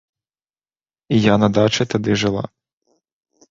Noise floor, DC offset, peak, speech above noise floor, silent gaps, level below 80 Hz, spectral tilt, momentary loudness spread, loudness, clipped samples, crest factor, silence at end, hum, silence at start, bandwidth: under -90 dBFS; under 0.1%; -2 dBFS; over 74 dB; none; -48 dBFS; -5.5 dB/octave; 9 LU; -17 LUFS; under 0.1%; 18 dB; 1.05 s; none; 1.1 s; 7.6 kHz